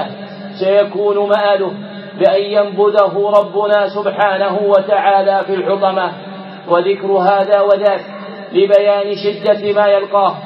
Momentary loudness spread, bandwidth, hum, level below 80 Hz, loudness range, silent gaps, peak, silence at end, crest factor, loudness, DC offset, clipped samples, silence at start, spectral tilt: 10 LU; 5.8 kHz; none; -72 dBFS; 1 LU; none; 0 dBFS; 0 s; 14 dB; -13 LUFS; under 0.1%; under 0.1%; 0 s; -7 dB/octave